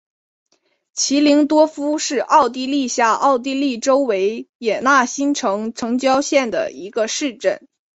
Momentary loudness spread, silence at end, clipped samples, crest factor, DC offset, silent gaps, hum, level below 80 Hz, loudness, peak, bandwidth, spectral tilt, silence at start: 8 LU; 0.35 s; under 0.1%; 16 dB; under 0.1%; 4.49-4.60 s; none; -64 dBFS; -17 LUFS; -2 dBFS; 8.2 kHz; -2.5 dB/octave; 0.95 s